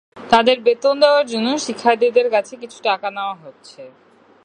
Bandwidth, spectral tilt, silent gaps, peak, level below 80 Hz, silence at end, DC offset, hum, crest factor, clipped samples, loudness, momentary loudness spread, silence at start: 10 kHz; -3 dB/octave; none; 0 dBFS; -62 dBFS; 0.55 s; under 0.1%; none; 18 dB; under 0.1%; -17 LUFS; 12 LU; 0.15 s